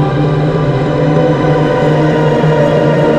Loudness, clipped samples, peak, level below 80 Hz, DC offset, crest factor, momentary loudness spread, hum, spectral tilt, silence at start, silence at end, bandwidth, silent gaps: -11 LUFS; under 0.1%; 0 dBFS; -34 dBFS; under 0.1%; 10 dB; 2 LU; none; -8 dB/octave; 0 s; 0 s; 8.2 kHz; none